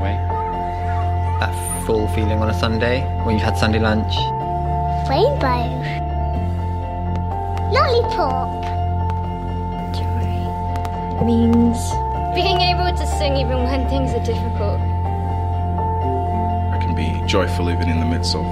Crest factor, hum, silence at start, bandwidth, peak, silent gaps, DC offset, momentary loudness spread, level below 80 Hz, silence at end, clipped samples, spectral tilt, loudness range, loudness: 16 dB; none; 0 s; 13.5 kHz; -2 dBFS; none; under 0.1%; 7 LU; -28 dBFS; 0 s; under 0.1%; -6.5 dB/octave; 2 LU; -20 LUFS